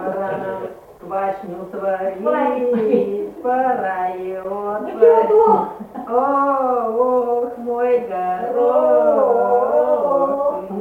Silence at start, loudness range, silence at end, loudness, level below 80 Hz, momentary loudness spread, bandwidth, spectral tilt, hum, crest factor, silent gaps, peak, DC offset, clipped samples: 0 s; 4 LU; 0 s; -18 LUFS; -58 dBFS; 12 LU; 4.3 kHz; -8 dB/octave; none; 16 dB; none; 0 dBFS; under 0.1%; under 0.1%